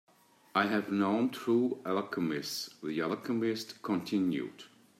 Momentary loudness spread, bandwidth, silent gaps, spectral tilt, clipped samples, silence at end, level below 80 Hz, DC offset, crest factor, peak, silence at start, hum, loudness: 8 LU; 16 kHz; none; -5.5 dB/octave; under 0.1%; 0.3 s; -80 dBFS; under 0.1%; 18 dB; -14 dBFS; 0.55 s; none; -33 LUFS